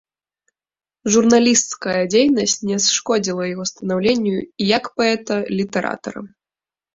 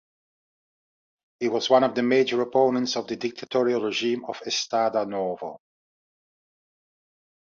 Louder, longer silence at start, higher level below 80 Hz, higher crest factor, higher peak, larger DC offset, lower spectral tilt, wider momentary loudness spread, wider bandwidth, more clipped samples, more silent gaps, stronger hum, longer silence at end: first, -18 LUFS vs -24 LUFS; second, 1.05 s vs 1.4 s; first, -58 dBFS vs -72 dBFS; about the same, 18 dB vs 22 dB; first, 0 dBFS vs -6 dBFS; neither; about the same, -3.5 dB/octave vs -4 dB/octave; about the same, 11 LU vs 10 LU; about the same, 7.8 kHz vs 7.6 kHz; neither; neither; neither; second, 0.65 s vs 2 s